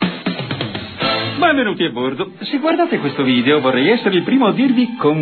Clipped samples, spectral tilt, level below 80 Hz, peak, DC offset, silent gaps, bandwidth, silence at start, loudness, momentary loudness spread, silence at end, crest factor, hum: under 0.1%; -9 dB/octave; -56 dBFS; -2 dBFS; under 0.1%; none; 4.6 kHz; 0 s; -16 LUFS; 9 LU; 0 s; 14 dB; none